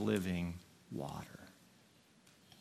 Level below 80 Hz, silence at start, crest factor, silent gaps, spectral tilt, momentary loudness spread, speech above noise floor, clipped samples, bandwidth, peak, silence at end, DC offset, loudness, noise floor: -70 dBFS; 0 s; 22 dB; none; -6.5 dB/octave; 24 LU; 28 dB; under 0.1%; 14.5 kHz; -22 dBFS; 0 s; under 0.1%; -42 LUFS; -67 dBFS